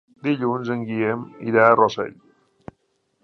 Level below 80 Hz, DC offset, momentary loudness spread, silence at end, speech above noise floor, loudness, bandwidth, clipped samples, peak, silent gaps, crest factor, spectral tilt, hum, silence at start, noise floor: -64 dBFS; under 0.1%; 13 LU; 1.15 s; 48 dB; -20 LUFS; 6.6 kHz; under 0.1%; -2 dBFS; none; 20 dB; -7 dB/octave; none; 0.25 s; -69 dBFS